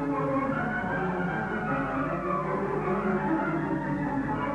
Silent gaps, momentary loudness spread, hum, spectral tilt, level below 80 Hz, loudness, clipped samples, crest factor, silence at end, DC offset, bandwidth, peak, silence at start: none; 2 LU; none; -8.5 dB/octave; -50 dBFS; -29 LUFS; under 0.1%; 12 dB; 0 s; under 0.1%; 10 kHz; -16 dBFS; 0 s